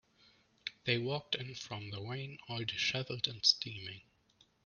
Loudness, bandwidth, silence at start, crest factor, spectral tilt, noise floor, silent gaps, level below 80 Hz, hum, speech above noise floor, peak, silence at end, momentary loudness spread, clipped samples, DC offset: -36 LUFS; 10 kHz; 0.65 s; 26 dB; -3.5 dB/octave; -70 dBFS; none; -74 dBFS; none; 33 dB; -14 dBFS; 0.65 s; 17 LU; under 0.1%; under 0.1%